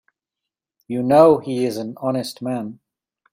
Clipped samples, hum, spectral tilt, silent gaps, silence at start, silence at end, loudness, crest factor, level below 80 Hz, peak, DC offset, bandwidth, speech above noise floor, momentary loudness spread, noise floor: under 0.1%; none; -6.5 dB/octave; none; 0.9 s; 0.6 s; -19 LUFS; 20 dB; -62 dBFS; -2 dBFS; under 0.1%; 16 kHz; 67 dB; 15 LU; -85 dBFS